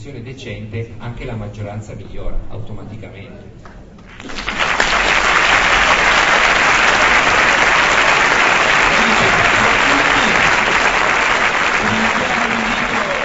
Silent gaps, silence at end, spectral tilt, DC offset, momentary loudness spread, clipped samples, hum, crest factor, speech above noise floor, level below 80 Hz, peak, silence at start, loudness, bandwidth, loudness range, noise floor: none; 0 s; -2.5 dB/octave; under 0.1%; 19 LU; under 0.1%; none; 14 dB; 11 dB; -32 dBFS; 0 dBFS; 0 s; -12 LUFS; 8.2 kHz; 18 LU; -36 dBFS